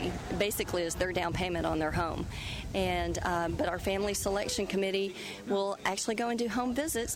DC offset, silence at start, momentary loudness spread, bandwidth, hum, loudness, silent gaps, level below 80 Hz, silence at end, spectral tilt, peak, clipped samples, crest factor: under 0.1%; 0 s; 4 LU; 16 kHz; none; -32 LUFS; none; -46 dBFS; 0 s; -4 dB/octave; -18 dBFS; under 0.1%; 14 dB